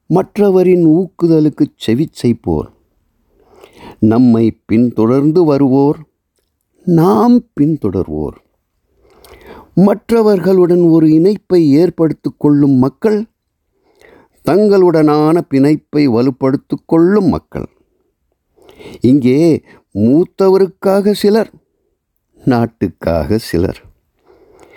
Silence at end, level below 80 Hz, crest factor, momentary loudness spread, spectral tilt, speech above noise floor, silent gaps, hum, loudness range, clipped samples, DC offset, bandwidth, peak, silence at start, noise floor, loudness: 1 s; -42 dBFS; 12 dB; 10 LU; -8.5 dB/octave; 55 dB; none; none; 4 LU; under 0.1%; under 0.1%; 17 kHz; -2 dBFS; 0.1 s; -66 dBFS; -12 LUFS